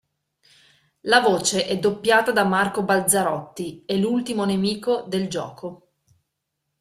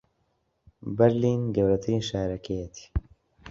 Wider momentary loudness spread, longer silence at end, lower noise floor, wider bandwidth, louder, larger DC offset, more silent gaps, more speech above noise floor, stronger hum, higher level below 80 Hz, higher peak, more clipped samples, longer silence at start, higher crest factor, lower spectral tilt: about the same, 15 LU vs 13 LU; first, 1.05 s vs 0 s; first, -79 dBFS vs -73 dBFS; first, 15 kHz vs 7.6 kHz; first, -21 LUFS vs -27 LUFS; neither; neither; first, 57 dB vs 48 dB; neither; second, -62 dBFS vs -42 dBFS; first, -2 dBFS vs -6 dBFS; neither; first, 1.05 s vs 0.8 s; about the same, 22 dB vs 22 dB; second, -3.5 dB/octave vs -7 dB/octave